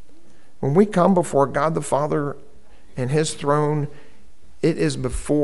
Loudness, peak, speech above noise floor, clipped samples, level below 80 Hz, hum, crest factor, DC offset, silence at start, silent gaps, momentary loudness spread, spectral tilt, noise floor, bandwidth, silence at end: -21 LUFS; -2 dBFS; 33 dB; under 0.1%; -42 dBFS; none; 18 dB; 2%; 0.6 s; none; 12 LU; -6.5 dB/octave; -53 dBFS; 12 kHz; 0 s